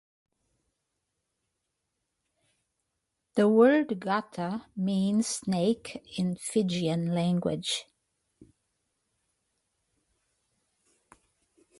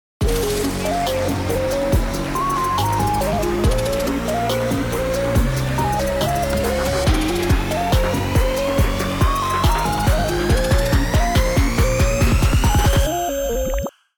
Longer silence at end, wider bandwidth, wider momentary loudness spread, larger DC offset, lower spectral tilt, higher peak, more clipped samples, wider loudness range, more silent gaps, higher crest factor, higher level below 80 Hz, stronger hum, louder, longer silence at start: first, 4 s vs 0.3 s; second, 11.5 kHz vs over 20 kHz; first, 12 LU vs 4 LU; neither; about the same, -5.5 dB/octave vs -5 dB/octave; second, -10 dBFS vs -4 dBFS; neither; first, 8 LU vs 2 LU; neither; first, 22 dB vs 14 dB; second, -70 dBFS vs -24 dBFS; neither; second, -28 LUFS vs -19 LUFS; first, 3.35 s vs 0.2 s